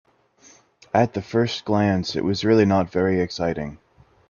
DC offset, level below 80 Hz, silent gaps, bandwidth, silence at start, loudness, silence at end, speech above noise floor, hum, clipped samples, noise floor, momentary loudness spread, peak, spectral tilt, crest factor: under 0.1%; -54 dBFS; none; 7.2 kHz; 0.95 s; -21 LUFS; 0.55 s; 33 dB; none; under 0.1%; -54 dBFS; 8 LU; -4 dBFS; -6.5 dB/octave; 18 dB